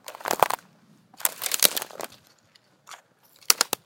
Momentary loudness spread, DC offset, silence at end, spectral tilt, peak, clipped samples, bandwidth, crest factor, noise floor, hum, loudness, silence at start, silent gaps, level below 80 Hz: 16 LU; under 0.1%; 0.1 s; 0.5 dB/octave; 0 dBFS; under 0.1%; 17.5 kHz; 28 dB; -61 dBFS; none; -24 LUFS; 0.1 s; none; -74 dBFS